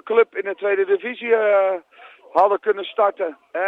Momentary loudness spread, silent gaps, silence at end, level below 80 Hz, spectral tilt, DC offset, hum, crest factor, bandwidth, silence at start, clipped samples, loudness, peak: 7 LU; none; 0 s; -76 dBFS; -5.5 dB/octave; under 0.1%; none; 16 dB; 4.7 kHz; 0.05 s; under 0.1%; -20 LUFS; -4 dBFS